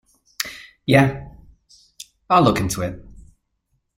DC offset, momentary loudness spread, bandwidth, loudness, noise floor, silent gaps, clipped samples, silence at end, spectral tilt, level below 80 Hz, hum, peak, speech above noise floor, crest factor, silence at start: under 0.1%; 25 LU; 16 kHz; -20 LUFS; -71 dBFS; none; under 0.1%; 0.75 s; -5.5 dB/octave; -46 dBFS; none; -2 dBFS; 54 dB; 20 dB; 0.4 s